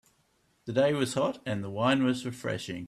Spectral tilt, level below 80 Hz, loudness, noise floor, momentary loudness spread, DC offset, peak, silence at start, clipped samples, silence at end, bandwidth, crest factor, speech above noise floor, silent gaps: -5.5 dB/octave; -66 dBFS; -29 LUFS; -70 dBFS; 9 LU; under 0.1%; -14 dBFS; 0.65 s; under 0.1%; 0 s; 13.5 kHz; 16 dB; 41 dB; none